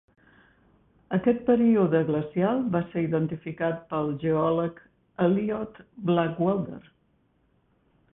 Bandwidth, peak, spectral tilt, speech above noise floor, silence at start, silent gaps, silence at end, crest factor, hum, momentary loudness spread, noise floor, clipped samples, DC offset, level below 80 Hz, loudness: 3.9 kHz; -10 dBFS; -12 dB/octave; 42 dB; 1.1 s; none; 1.35 s; 18 dB; none; 12 LU; -67 dBFS; under 0.1%; under 0.1%; -60 dBFS; -26 LUFS